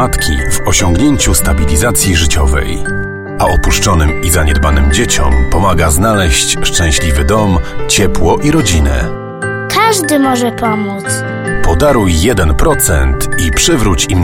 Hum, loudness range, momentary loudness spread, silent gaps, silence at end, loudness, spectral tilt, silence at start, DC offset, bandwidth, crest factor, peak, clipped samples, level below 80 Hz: none; 2 LU; 6 LU; none; 0 s; -11 LUFS; -4 dB/octave; 0 s; under 0.1%; 17 kHz; 10 dB; 0 dBFS; under 0.1%; -16 dBFS